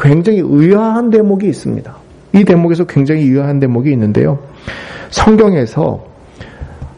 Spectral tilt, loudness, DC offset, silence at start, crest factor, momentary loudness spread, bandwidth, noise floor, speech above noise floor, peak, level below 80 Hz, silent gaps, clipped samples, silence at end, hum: -8 dB/octave; -11 LUFS; under 0.1%; 0 s; 12 dB; 17 LU; 10.5 kHz; -34 dBFS; 23 dB; 0 dBFS; -36 dBFS; none; under 0.1%; 0.1 s; none